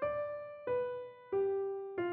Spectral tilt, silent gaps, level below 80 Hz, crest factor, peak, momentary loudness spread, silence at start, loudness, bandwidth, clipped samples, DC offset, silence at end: -5.5 dB/octave; none; -72 dBFS; 12 dB; -26 dBFS; 8 LU; 0 s; -38 LUFS; 4.3 kHz; under 0.1%; under 0.1%; 0 s